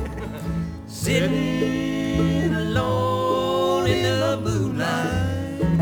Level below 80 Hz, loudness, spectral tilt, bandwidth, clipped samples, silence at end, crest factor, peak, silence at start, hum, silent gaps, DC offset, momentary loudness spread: -38 dBFS; -23 LUFS; -6 dB/octave; over 20 kHz; under 0.1%; 0 s; 16 dB; -6 dBFS; 0 s; none; none; under 0.1%; 8 LU